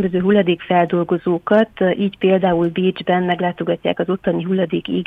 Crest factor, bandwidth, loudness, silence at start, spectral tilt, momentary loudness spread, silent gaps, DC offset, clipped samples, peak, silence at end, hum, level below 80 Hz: 14 dB; 4.6 kHz; -18 LUFS; 0 s; -9 dB/octave; 5 LU; none; under 0.1%; under 0.1%; -4 dBFS; 0 s; none; -52 dBFS